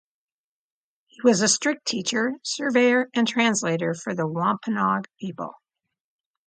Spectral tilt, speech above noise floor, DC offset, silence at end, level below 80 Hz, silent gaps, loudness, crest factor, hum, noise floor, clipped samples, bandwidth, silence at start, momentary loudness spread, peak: -3.5 dB/octave; over 67 dB; under 0.1%; 0.95 s; -72 dBFS; none; -23 LUFS; 20 dB; none; under -90 dBFS; under 0.1%; 9.6 kHz; 1.2 s; 11 LU; -6 dBFS